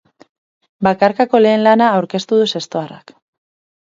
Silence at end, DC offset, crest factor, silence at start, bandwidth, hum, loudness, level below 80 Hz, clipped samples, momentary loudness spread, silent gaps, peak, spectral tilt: 0.85 s; under 0.1%; 16 dB; 0.8 s; 7.8 kHz; none; -14 LUFS; -58 dBFS; under 0.1%; 12 LU; none; 0 dBFS; -5.5 dB/octave